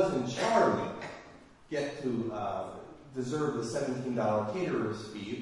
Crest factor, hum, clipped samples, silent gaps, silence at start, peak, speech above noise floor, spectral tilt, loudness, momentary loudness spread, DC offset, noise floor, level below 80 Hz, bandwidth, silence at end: 20 dB; none; under 0.1%; none; 0 s; -12 dBFS; 21 dB; -5.5 dB/octave; -32 LUFS; 15 LU; under 0.1%; -54 dBFS; -64 dBFS; 11.5 kHz; 0 s